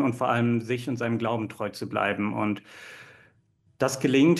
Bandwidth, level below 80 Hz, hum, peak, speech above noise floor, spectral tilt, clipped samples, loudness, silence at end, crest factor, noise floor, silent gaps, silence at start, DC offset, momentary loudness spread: 12.5 kHz; -68 dBFS; none; -10 dBFS; 39 dB; -6 dB/octave; under 0.1%; -27 LUFS; 0 s; 16 dB; -65 dBFS; none; 0 s; under 0.1%; 17 LU